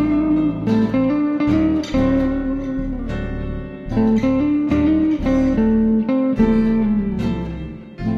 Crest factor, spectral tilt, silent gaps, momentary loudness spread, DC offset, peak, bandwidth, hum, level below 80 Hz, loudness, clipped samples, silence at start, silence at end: 14 dB; -8.5 dB/octave; none; 10 LU; under 0.1%; -4 dBFS; 7.2 kHz; none; -32 dBFS; -18 LUFS; under 0.1%; 0 s; 0 s